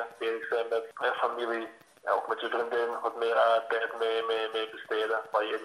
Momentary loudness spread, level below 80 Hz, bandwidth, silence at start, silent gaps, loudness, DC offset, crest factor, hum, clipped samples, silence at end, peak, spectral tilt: 8 LU; -86 dBFS; 13.5 kHz; 0 s; none; -30 LUFS; under 0.1%; 18 dB; none; under 0.1%; 0 s; -12 dBFS; -2.5 dB/octave